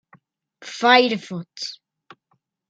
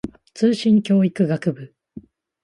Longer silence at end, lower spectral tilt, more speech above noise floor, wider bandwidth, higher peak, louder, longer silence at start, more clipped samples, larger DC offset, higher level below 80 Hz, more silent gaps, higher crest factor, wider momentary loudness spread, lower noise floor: first, 0.95 s vs 0.45 s; second, -3.5 dB/octave vs -7.5 dB/octave; first, 50 dB vs 25 dB; second, 9 kHz vs 11 kHz; first, 0 dBFS vs -6 dBFS; about the same, -19 LUFS vs -19 LUFS; first, 0.6 s vs 0.05 s; neither; neither; second, -78 dBFS vs -56 dBFS; neither; first, 22 dB vs 16 dB; about the same, 20 LU vs 19 LU; first, -70 dBFS vs -43 dBFS